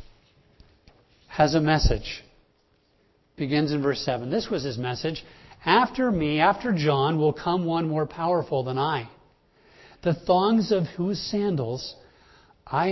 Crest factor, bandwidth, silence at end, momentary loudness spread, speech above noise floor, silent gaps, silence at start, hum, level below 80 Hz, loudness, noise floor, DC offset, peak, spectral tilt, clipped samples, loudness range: 22 dB; 6.2 kHz; 0 s; 11 LU; 41 dB; none; 0 s; none; -40 dBFS; -25 LUFS; -65 dBFS; under 0.1%; -4 dBFS; -6.5 dB/octave; under 0.1%; 4 LU